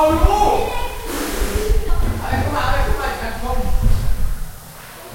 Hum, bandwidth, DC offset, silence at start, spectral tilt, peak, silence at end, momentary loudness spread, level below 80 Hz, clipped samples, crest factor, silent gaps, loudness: none; 16.5 kHz; under 0.1%; 0 s; -5 dB/octave; 0 dBFS; 0 s; 14 LU; -20 dBFS; under 0.1%; 16 dB; none; -21 LUFS